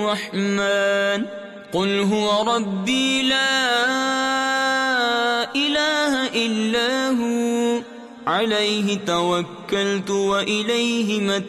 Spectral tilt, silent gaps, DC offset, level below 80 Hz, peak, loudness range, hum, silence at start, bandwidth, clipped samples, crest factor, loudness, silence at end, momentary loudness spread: -3.5 dB/octave; none; under 0.1%; -62 dBFS; -10 dBFS; 3 LU; none; 0 s; 14 kHz; under 0.1%; 12 dB; -20 LUFS; 0 s; 5 LU